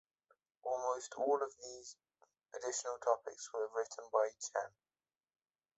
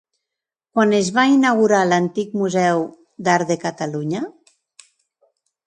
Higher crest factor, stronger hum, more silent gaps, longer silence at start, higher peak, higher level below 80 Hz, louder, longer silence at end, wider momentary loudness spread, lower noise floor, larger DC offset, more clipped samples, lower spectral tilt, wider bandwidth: about the same, 22 dB vs 18 dB; neither; neither; about the same, 0.65 s vs 0.75 s; second, -18 dBFS vs -2 dBFS; second, -86 dBFS vs -66 dBFS; second, -39 LUFS vs -18 LUFS; second, 1.1 s vs 1.35 s; first, 14 LU vs 11 LU; first, under -90 dBFS vs -85 dBFS; neither; neither; second, -1 dB/octave vs -5 dB/octave; second, 8.2 kHz vs 11 kHz